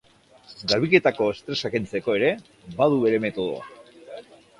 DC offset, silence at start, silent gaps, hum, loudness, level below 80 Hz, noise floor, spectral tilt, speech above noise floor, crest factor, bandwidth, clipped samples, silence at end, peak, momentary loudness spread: under 0.1%; 0.5 s; none; none; -23 LUFS; -60 dBFS; -52 dBFS; -5.5 dB/octave; 29 dB; 22 dB; 11.5 kHz; under 0.1%; 0.4 s; -2 dBFS; 23 LU